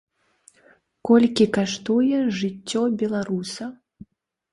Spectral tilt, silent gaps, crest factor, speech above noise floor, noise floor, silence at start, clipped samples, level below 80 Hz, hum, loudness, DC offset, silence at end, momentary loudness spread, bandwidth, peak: -5.5 dB/octave; none; 18 dB; 37 dB; -58 dBFS; 1.05 s; under 0.1%; -62 dBFS; none; -22 LUFS; under 0.1%; 0.8 s; 15 LU; 11.5 kHz; -4 dBFS